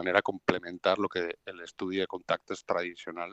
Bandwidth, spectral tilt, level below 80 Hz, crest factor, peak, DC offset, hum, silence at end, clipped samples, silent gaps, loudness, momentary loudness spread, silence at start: 8.4 kHz; -5 dB/octave; -74 dBFS; 26 dB; -6 dBFS; under 0.1%; none; 0 s; under 0.1%; none; -32 LUFS; 11 LU; 0 s